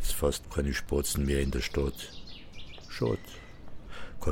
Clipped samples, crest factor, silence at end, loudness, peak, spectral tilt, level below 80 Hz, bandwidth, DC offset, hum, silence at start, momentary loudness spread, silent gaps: under 0.1%; 16 dB; 0 s; -32 LUFS; -14 dBFS; -4.5 dB/octave; -38 dBFS; 16.5 kHz; under 0.1%; none; 0 s; 18 LU; none